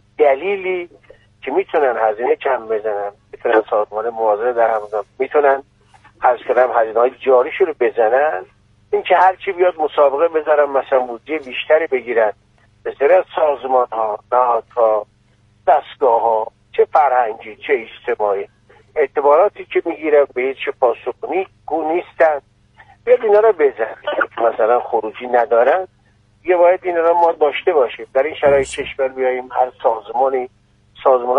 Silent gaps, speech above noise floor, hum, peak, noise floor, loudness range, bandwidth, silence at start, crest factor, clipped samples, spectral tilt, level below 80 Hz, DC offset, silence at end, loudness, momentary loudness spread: none; 38 dB; 50 Hz at -60 dBFS; 0 dBFS; -54 dBFS; 3 LU; 10 kHz; 0.2 s; 16 dB; under 0.1%; -5 dB/octave; -56 dBFS; under 0.1%; 0 s; -17 LUFS; 9 LU